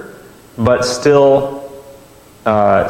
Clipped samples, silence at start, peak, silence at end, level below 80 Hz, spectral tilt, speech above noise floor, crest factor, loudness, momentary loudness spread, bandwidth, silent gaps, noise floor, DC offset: under 0.1%; 0 s; 0 dBFS; 0 s; -44 dBFS; -5.5 dB/octave; 30 dB; 14 dB; -13 LUFS; 20 LU; 16 kHz; none; -42 dBFS; under 0.1%